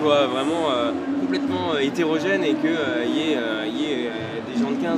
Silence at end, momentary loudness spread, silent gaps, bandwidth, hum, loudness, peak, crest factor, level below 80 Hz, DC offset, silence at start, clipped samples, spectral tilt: 0 s; 4 LU; none; 11.5 kHz; none; -23 LUFS; -6 dBFS; 16 dB; -64 dBFS; under 0.1%; 0 s; under 0.1%; -5 dB/octave